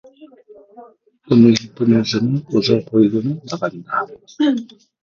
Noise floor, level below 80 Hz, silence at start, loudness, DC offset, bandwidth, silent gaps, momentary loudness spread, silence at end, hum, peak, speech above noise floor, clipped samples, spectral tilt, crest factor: -45 dBFS; -56 dBFS; 0.2 s; -17 LUFS; under 0.1%; 7.2 kHz; none; 12 LU; 0.35 s; none; 0 dBFS; 29 dB; under 0.1%; -6.5 dB/octave; 18 dB